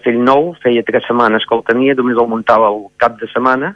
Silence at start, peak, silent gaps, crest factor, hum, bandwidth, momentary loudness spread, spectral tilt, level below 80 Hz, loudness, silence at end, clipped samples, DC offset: 0.05 s; 0 dBFS; none; 12 dB; none; 7.4 kHz; 4 LU; -7 dB/octave; -54 dBFS; -13 LUFS; 0 s; 0.2%; under 0.1%